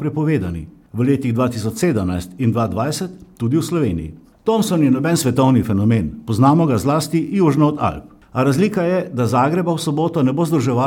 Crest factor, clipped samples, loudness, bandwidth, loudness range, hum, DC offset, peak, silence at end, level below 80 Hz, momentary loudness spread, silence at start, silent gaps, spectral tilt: 16 dB; under 0.1%; -18 LUFS; 17.5 kHz; 4 LU; none; under 0.1%; -2 dBFS; 0 s; -44 dBFS; 9 LU; 0 s; none; -7 dB/octave